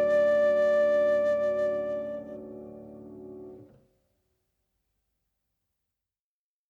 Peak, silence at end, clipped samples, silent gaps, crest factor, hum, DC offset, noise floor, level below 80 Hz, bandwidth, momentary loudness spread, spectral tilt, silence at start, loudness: -18 dBFS; 3.05 s; under 0.1%; none; 12 dB; none; under 0.1%; under -90 dBFS; -66 dBFS; 7.2 kHz; 22 LU; -6 dB/octave; 0 s; -25 LUFS